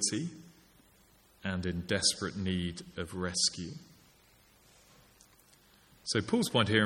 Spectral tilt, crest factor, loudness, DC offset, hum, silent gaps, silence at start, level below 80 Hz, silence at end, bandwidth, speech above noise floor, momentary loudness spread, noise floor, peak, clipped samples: -3.5 dB/octave; 24 dB; -32 LUFS; under 0.1%; none; none; 0 s; -60 dBFS; 0 s; 17 kHz; 32 dB; 15 LU; -64 dBFS; -12 dBFS; under 0.1%